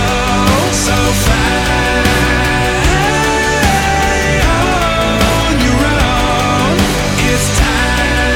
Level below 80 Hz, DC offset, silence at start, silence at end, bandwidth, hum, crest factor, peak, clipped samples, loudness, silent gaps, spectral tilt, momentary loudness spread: -18 dBFS; under 0.1%; 0 s; 0 s; 18.5 kHz; none; 10 dB; 0 dBFS; under 0.1%; -12 LUFS; none; -4 dB/octave; 1 LU